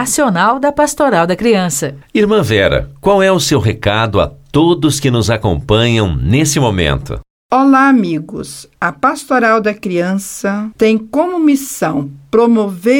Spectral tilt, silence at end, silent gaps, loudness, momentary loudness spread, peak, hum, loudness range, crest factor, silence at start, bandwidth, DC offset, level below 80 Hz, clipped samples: -5 dB/octave; 0 s; 7.30-7.49 s; -13 LUFS; 8 LU; 0 dBFS; none; 2 LU; 12 dB; 0 s; 17.5 kHz; under 0.1%; -32 dBFS; under 0.1%